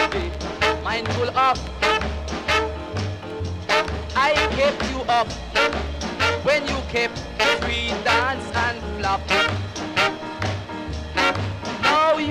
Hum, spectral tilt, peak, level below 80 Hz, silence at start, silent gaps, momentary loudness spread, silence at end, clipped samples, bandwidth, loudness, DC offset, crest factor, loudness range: none; -4 dB/octave; -4 dBFS; -36 dBFS; 0 s; none; 9 LU; 0 s; under 0.1%; 15.5 kHz; -22 LUFS; under 0.1%; 18 dB; 1 LU